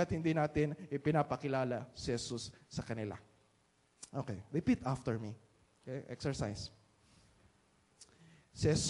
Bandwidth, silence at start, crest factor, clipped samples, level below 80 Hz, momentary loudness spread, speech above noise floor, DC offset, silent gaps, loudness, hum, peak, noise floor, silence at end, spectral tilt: 11.5 kHz; 0 s; 20 dB; under 0.1%; -60 dBFS; 14 LU; 36 dB; under 0.1%; none; -38 LUFS; none; -18 dBFS; -73 dBFS; 0 s; -5.5 dB/octave